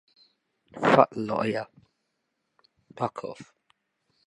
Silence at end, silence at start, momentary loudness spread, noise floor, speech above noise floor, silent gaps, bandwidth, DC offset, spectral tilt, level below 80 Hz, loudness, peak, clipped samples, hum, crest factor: 0.85 s; 0.75 s; 24 LU; -79 dBFS; 53 dB; none; 11 kHz; under 0.1%; -6.5 dB/octave; -70 dBFS; -25 LUFS; -2 dBFS; under 0.1%; none; 28 dB